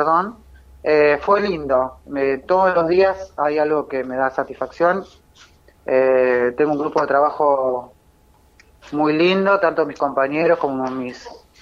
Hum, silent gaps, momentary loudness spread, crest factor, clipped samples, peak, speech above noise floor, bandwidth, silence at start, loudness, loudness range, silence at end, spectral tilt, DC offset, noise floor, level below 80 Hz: none; none; 10 LU; 16 dB; under 0.1%; -4 dBFS; 36 dB; 7.4 kHz; 0 s; -18 LUFS; 2 LU; 0.3 s; -6.5 dB/octave; under 0.1%; -54 dBFS; -52 dBFS